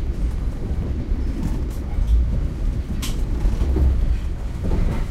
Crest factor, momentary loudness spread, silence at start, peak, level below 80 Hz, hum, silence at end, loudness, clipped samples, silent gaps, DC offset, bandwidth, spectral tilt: 12 dB; 6 LU; 0 s; -8 dBFS; -22 dBFS; none; 0 s; -24 LUFS; under 0.1%; none; under 0.1%; 13.5 kHz; -7 dB/octave